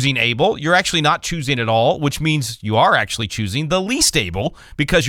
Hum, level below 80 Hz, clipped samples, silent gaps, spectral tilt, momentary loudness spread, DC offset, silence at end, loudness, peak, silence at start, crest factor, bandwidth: none; -38 dBFS; under 0.1%; none; -3.5 dB/octave; 7 LU; under 0.1%; 0 s; -17 LUFS; -2 dBFS; 0 s; 16 dB; 18 kHz